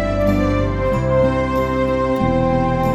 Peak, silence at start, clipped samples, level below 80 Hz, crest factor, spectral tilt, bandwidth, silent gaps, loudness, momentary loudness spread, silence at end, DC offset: -4 dBFS; 0 s; under 0.1%; -28 dBFS; 12 dB; -8 dB/octave; 13.5 kHz; none; -18 LUFS; 2 LU; 0 s; under 0.1%